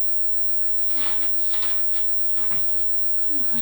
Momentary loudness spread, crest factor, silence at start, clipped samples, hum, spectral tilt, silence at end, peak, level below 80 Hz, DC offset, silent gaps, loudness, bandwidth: 0 LU; 8 dB; 0 s; under 0.1%; none; -3 dB/octave; 0 s; -12 dBFS; -52 dBFS; under 0.1%; none; -17 LUFS; over 20 kHz